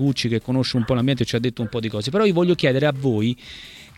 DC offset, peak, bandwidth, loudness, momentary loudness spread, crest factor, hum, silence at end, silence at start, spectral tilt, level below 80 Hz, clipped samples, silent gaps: under 0.1%; -6 dBFS; 13.5 kHz; -21 LUFS; 8 LU; 16 dB; none; 0.1 s; 0 s; -6.5 dB/octave; -50 dBFS; under 0.1%; none